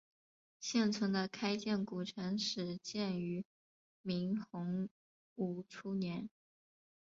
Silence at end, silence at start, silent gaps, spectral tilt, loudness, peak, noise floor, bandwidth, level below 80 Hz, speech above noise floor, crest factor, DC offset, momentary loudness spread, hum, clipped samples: 0.7 s; 0.6 s; 3.45-4.04 s, 4.91-5.36 s; -5 dB/octave; -39 LUFS; -22 dBFS; under -90 dBFS; 7.6 kHz; -78 dBFS; over 52 dB; 18 dB; under 0.1%; 11 LU; none; under 0.1%